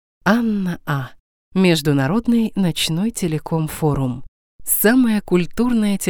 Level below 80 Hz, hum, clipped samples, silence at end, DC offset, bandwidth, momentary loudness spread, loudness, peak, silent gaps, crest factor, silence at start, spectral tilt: -42 dBFS; none; under 0.1%; 0 s; under 0.1%; over 20 kHz; 10 LU; -18 LUFS; -2 dBFS; 1.20-1.52 s, 4.28-4.59 s; 18 dB; 0.25 s; -5 dB/octave